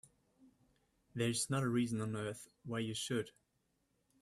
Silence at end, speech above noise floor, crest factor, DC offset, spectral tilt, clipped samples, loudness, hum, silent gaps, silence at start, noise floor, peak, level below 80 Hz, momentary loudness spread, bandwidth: 0.9 s; 43 dB; 18 dB; under 0.1%; -4.5 dB/octave; under 0.1%; -38 LUFS; none; none; 0.45 s; -81 dBFS; -24 dBFS; -74 dBFS; 13 LU; 15 kHz